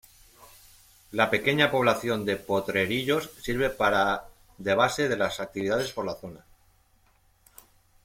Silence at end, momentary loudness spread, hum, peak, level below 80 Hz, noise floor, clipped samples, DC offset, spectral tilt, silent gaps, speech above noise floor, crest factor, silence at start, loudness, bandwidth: 1.7 s; 11 LU; none; -8 dBFS; -54 dBFS; -63 dBFS; under 0.1%; under 0.1%; -4.5 dB/octave; none; 37 dB; 20 dB; 0.4 s; -26 LUFS; 16.5 kHz